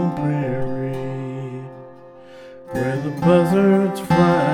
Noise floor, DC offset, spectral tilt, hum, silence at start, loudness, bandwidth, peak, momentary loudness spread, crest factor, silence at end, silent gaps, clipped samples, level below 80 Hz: -41 dBFS; under 0.1%; -8 dB/octave; none; 0 s; -19 LUFS; 14 kHz; -4 dBFS; 20 LU; 16 dB; 0 s; none; under 0.1%; -48 dBFS